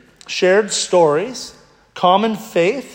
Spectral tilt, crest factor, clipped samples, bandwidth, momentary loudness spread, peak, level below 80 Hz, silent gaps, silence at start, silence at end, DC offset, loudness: -3.5 dB/octave; 16 dB; under 0.1%; 16.5 kHz; 12 LU; 0 dBFS; -62 dBFS; none; 0.3 s; 0 s; under 0.1%; -16 LUFS